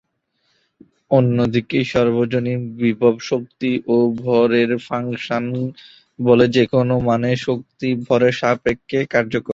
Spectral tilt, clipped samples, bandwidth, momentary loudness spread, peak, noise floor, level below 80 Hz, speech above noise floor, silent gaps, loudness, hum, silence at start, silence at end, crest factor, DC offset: -7 dB/octave; under 0.1%; 7.8 kHz; 8 LU; -2 dBFS; -68 dBFS; -50 dBFS; 50 dB; none; -18 LUFS; none; 1.1 s; 0 s; 16 dB; under 0.1%